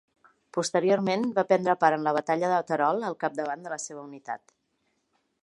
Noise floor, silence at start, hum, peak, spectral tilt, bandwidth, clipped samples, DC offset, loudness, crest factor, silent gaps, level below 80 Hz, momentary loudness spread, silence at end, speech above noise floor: -75 dBFS; 0.55 s; none; -6 dBFS; -5 dB/octave; 11.5 kHz; under 0.1%; under 0.1%; -26 LUFS; 22 dB; none; -78 dBFS; 15 LU; 1.05 s; 48 dB